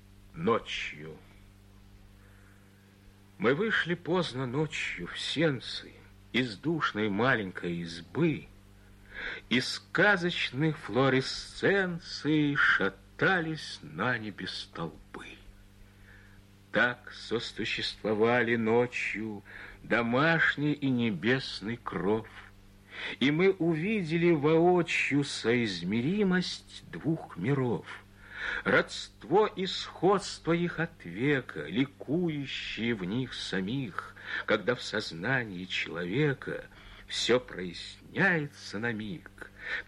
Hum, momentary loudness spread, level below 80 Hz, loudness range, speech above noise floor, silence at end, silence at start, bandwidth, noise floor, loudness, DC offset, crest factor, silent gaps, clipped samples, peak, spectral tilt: 50 Hz at -65 dBFS; 14 LU; -58 dBFS; 6 LU; 27 dB; 0.05 s; 0.25 s; 12 kHz; -57 dBFS; -30 LUFS; under 0.1%; 18 dB; none; under 0.1%; -12 dBFS; -5.5 dB/octave